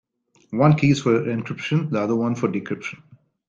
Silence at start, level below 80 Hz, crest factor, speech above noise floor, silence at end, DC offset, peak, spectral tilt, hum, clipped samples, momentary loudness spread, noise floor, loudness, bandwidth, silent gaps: 0.5 s; -58 dBFS; 18 dB; 34 dB; 0.5 s; under 0.1%; -4 dBFS; -7 dB/octave; none; under 0.1%; 13 LU; -55 dBFS; -21 LUFS; 7.6 kHz; none